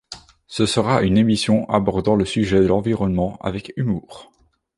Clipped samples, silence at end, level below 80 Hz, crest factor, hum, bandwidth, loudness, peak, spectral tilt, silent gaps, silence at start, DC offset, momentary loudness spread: under 0.1%; 0.55 s; -42 dBFS; 18 dB; none; 11.5 kHz; -19 LUFS; -2 dBFS; -6 dB/octave; none; 0.1 s; under 0.1%; 11 LU